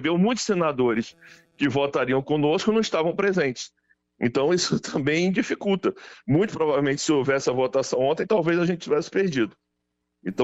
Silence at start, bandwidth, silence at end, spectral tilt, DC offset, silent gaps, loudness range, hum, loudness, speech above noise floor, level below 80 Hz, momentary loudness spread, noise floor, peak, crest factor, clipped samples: 0 s; 8.2 kHz; 0 s; -5 dB/octave; under 0.1%; none; 1 LU; none; -23 LUFS; 55 dB; -58 dBFS; 7 LU; -78 dBFS; -10 dBFS; 14 dB; under 0.1%